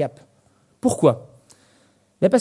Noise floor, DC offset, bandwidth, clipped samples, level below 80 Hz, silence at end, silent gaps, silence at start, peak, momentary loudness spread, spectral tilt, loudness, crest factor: -60 dBFS; under 0.1%; 12 kHz; under 0.1%; -64 dBFS; 0 s; none; 0 s; -2 dBFS; 11 LU; -6.5 dB/octave; -21 LUFS; 20 dB